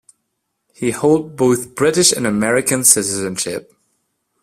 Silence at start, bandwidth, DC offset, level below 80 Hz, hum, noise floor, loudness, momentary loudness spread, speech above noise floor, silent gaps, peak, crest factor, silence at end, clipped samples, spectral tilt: 0.8 s; 16 kHz; under 0.1%; -54 dBFS; none; -73 dBFS; -15 LUFS; 11 LU; 57 dB; none; 0 dBFS; 18 dB; 0.85 s; under 0.1%; -3 dB/octave